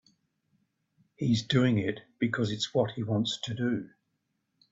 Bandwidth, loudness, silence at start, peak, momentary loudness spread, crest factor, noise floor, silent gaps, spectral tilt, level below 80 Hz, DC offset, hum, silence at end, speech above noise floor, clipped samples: 7.8 kHz; -30 LUFS; 1.2 s; -10 dBFS; 9 LU; 20 dB; -79 dBFS; none; -6 dB/octave; -64 dBFS; under 0.1%; none; 0.85 s; 50 dB; under 0.1%